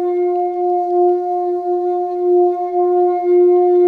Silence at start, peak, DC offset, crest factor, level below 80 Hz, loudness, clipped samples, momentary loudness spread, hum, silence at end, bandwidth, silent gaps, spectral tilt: 0 s; -6 dBFS; under 0.1%; 8 dB; -72 dBFS; -15 LUFS; under 0.1%; 7 LU; none; 0 s; 2.3 kHz; none; -8 dB/octave